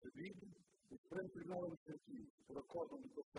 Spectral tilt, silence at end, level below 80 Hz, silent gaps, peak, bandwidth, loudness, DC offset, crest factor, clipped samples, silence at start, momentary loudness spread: -7.5 dB/octave; 0 s; -82 dBFS; 0.98-1.04 s, 1.77-1.86 s, 2.30-2.38 s, 3.24-3.32 s; -34 dBFS; 11 kHz; -52 LUFS; under 0.1%; 18 dB; under 0.1%; 0 s; 15 LU